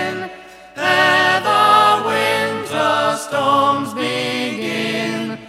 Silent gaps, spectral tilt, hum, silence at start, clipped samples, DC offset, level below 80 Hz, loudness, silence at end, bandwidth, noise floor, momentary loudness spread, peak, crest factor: none; -3.5 dB/octave; none; 0 s; under 0.1%; under 0.1%; -62 dBFS; -16 LUFS; 0 s; 16.5 kHz; -38 dBFS; 10 LU; -2 dBFS; 16 dB